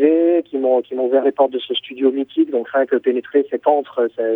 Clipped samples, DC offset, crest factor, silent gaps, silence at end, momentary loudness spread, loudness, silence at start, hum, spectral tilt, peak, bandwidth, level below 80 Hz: under 0.1%; under 0.1%; 16 dB; none; 0 s; 4 LU; -18 LUFS; 0 s; none; -7 dB/octave; -2 dBFS; 3.9 kHz; -72 dBFS